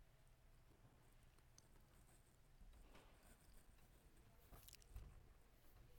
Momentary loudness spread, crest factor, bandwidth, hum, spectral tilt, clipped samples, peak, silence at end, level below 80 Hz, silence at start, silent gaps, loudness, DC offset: 6 LU; 26 dB; 18 kHz; none; -4 dB/octave; under 0.1%; -40 dBFS; 0 s; -70 dBFS; 0 s; none; -65 LUFS; under 0.1%